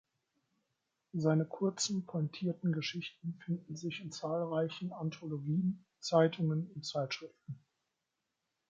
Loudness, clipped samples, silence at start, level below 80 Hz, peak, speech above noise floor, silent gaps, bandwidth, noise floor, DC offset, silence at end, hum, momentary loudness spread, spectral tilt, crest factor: -36 LUFS; under 0.1%; 1.15 s; -80 dBFS; -14 dBFS; 51 dB; none; 9.2 kHz; -87 dBFS; under 0.1%; 1.15 s; none; 11 LU; -5.5 dB/octave; 22 dB